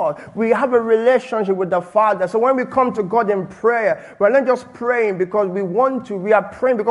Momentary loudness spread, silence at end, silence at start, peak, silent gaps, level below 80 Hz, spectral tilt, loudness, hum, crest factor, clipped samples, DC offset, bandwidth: 5 LU; 0 s; 0 s; -2 dBFS; none; -62 dBFS; -7 dB/octave; -18 LUFS; none; 16 dB; under 0.1%; under 0.1%; 11 kHz